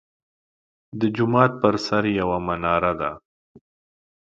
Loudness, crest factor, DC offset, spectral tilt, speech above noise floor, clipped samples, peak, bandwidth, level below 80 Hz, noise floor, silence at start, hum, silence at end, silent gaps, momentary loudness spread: -22 LUFS; 24 dB; under 0.1%; -7 dB/octave; over 69 dB; under 0.1%; 0 dBFS; 7.8 kHz; -50 dBFS; under -90 dBFS; 0.95 s; none; 0.75 s; 3.25-3.55 s; 10 LU